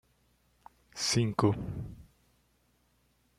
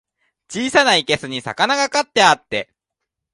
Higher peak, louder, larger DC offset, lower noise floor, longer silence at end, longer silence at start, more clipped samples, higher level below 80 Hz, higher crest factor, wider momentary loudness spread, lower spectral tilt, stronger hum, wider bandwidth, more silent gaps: second, -12 dBFS vs 0 dBFS; second, -31 LUFS vs -17 LUFS; neither; second, -71 dBFS vs -81 dBFS; first, 1.35 s vs 0.7 s; first, 0.95 s vs 0.5 s; neither; about the same, -56 dBFS vs -58 dBFS; first, 24 dB vs 18 dB; first, 18 LU vs 12 LU; first, -4.5 dB/octave vs -2.5 dB/octave; neither; first, 14 kHz vs 11.5 kHz; neither